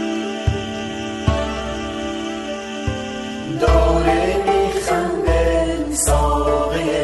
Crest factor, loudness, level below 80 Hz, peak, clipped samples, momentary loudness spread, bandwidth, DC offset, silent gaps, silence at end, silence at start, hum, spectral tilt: 16 dB; -20 LUFS; -26 dBFS; -2 dBFS; under 0.1%; 10 LU; 12 kHz; under 0.1%; none; 0 s; 0 s; none; -5 dB/octave